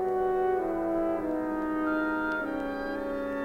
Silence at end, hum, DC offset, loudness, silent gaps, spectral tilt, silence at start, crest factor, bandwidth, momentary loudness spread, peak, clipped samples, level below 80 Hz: 0 s; none; under 0.1%; -30 LUFS; none; -7 dB/octave; 0 s; 12 dB; 16 kHz; 5 LU; -18 dBFS; under 0.1%; -52 dBFS